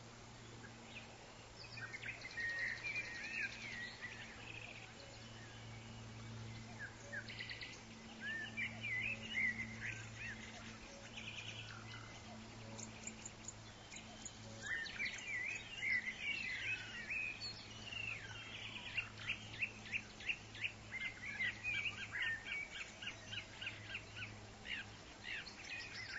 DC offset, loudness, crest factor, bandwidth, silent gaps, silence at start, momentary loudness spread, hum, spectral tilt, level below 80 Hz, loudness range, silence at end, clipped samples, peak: under 0.1%; -45 LUFS; 20 dB; 7.6 kHz; none; 0 s; 13 LU; none; -1.5 dB/octave; -66 dBFS; 9 LU; 0 s; under 0.1%; -28 dBFS